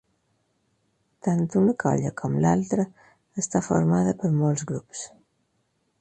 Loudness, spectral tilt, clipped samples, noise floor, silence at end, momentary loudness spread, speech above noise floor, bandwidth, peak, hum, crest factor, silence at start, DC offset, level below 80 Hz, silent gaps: -24 LUFS; -7 dB/octave; under 0.1%; -72 dBFS; 0.95 s; 11 LU; 48 dB; 9 kHz; -8 dBFS; none; 18 dB; 1.25 s; under 0.1%; -58 dBFS; none